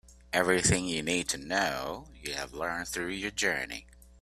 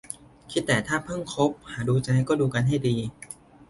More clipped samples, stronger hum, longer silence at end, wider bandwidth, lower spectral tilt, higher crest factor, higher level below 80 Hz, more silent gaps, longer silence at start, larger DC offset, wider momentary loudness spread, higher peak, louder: neither; neither; about the same, 0.15 s vs 0.05 s; first, 15.5 kHz vs 11.5 kHz; second, -3 dB/octave vs -6 dB/octave; about the same, 22 dB vs 18 dB; about the same, -52 dBFS vs -54 dBFS; neither; about the same, 0.1 s vs 0.1 s; neither; second, 13 LU vs 16 LU; about the same, -10 dBFS vs -8 dBFS; second, -30 LUFS vs -26 LUFS